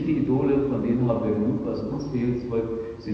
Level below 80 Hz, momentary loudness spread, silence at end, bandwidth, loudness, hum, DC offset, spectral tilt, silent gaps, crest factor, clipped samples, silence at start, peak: -46 dBFS; 7 LU; 0 s; 6.4 kHz; -25 LUFS; none; under 0.1%; -10 dB/octave; none; 14 dB; under 0.1%; 0 s; -10 dBFS